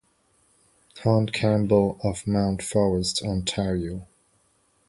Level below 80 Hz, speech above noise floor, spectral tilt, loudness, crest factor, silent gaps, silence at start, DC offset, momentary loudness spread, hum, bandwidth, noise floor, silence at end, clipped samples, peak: -46 dBFS; 42 dB; -5.5 dB/octave; -24 LUFS; 18 dB; none; 0.95 s; under 0.1%; 8 LU; none; 11.5 kHz; -66 dBFS; 0.85 s; under 0.1%; -6 dBFS